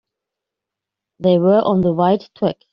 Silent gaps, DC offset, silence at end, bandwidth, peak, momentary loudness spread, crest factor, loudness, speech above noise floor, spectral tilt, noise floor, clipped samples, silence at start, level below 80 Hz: none; under 0.1%; 0.2 s; 5.8 kHz; -4 dBFS; 8 LU; 16 dB; -16 LUFS; 69 dB; -7.5 dB/octave; -84 dBFS; under 0.1%; 1.2 s; -54 dBFS